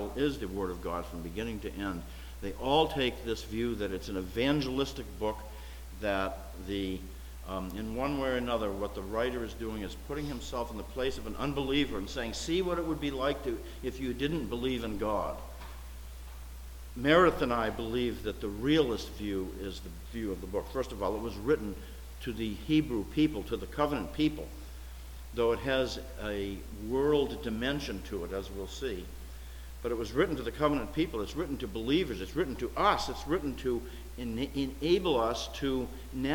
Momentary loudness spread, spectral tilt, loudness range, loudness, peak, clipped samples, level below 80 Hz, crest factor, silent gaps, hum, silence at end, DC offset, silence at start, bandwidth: 14 LU; -5.5 dB/octave; 4 LU; -33 LUFS; -12 dBFS; under 0.1%; -44 dBFS; 22 dB; none; none; 0 s; under 0.1%; 0 s; 19 kHz